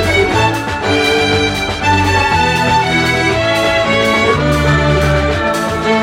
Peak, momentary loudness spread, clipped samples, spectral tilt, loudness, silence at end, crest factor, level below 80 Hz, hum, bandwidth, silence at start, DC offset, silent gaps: 0 dBFS; 3 LU; under 0.1%; -5 dB/octave; -12 LUFS; 0 s; 12 dB; -26 dBFS; none; 16.5 kHz; 0 s; under 0.1%; none